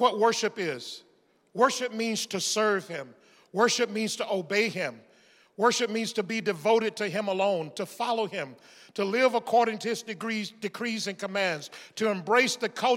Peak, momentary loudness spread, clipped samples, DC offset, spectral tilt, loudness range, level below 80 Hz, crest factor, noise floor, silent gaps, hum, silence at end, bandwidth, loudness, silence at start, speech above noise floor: -8 dBFS; 12 LU; under 0.1%; under 0.1%; -3 dB/octave; 1 LU; -86 dBFS; 20 dB; -60 dBFS; none; none; 0 s; 16.5 kHz; -28 LUFS; 0 s; 32 dB